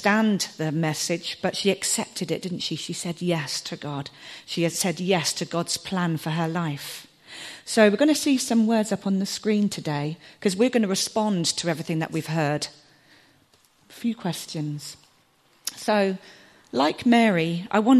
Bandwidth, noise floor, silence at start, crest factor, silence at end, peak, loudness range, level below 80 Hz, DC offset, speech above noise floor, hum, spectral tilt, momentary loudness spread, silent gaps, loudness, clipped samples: 13 kHz; -61 dBFS; 0 s; 20 dB; 0 s; -4 dBFS; 7 LU; -68 dBFS; under 0.1%; 37 dB; none; -4.5 dB/octave; 13 LU; none; -24 LUFS; under 0.1%